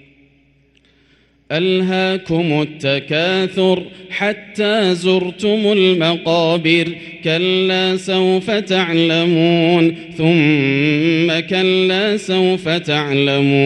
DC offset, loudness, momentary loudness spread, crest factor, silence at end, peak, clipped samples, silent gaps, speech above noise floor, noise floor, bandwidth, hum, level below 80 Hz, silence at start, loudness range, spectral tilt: under 0.1%; -15 LUFS; 6 LU; 16 dB; 0 s; 0 dBFS; under 0.1%; none; 39 dB; -54 dBFS; 11 kHz; none; -56 dBFS; 1.5 s; 3 LU; -6 dB/octave